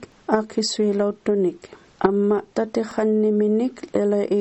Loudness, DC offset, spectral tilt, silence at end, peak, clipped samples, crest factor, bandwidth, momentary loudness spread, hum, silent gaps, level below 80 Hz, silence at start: -22 LUFS; under 0.1%; -5.5 dB/octave; 0 s; -2 dBFS; under 0.1%; 20 dB; 8.4 kHz; 5 LU; none; none; -60 dBFS; 0 s